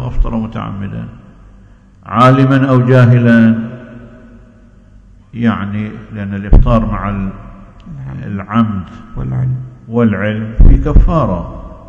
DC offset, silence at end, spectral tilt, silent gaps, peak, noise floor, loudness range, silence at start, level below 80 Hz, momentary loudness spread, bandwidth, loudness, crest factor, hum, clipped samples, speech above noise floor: under 0.1%; 0 s; -9 dB/octave; none; 0 dBFS; -41 dBFS; 7 LU; 0 s; -18 dBFS; 19 LU; 6.8 kHz; -13 LUFS; 12 dB; none; 2%; 30 dB